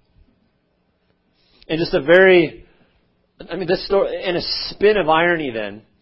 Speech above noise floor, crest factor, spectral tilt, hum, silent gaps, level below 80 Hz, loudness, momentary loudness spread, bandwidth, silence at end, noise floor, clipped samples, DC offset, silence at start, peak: 48 dB; 20 dB; -8 dB/octave; none; none; -48 dBFS; -17 LUFS; 15 LU; 5.8 kHz; 0.2 s; -65 dBFS; under 0.1%; under 0.1%; 1.7 s; 0 dBFS